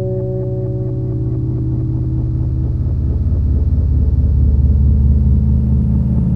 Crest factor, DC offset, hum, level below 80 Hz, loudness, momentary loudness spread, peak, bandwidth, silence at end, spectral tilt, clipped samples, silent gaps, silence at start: 12 dB; 2%; none; -16 dBFS; -16 LUFS; 7 LU; -2 dBFS; 1.4 kHz; 0 s; -13 dB/octave; under 0.1%; none; 0 s